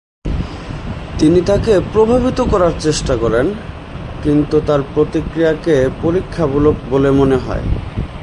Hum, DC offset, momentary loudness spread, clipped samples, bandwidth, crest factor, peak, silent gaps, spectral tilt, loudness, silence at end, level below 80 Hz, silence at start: none; under 0.1%; 13 LU; under 0.1%; 11.5 kHz; 14 dB; 0 dBFS; none; -6.5 dB/octave; -15 LUFS; 0 s; -26 dBFS; 0.25 s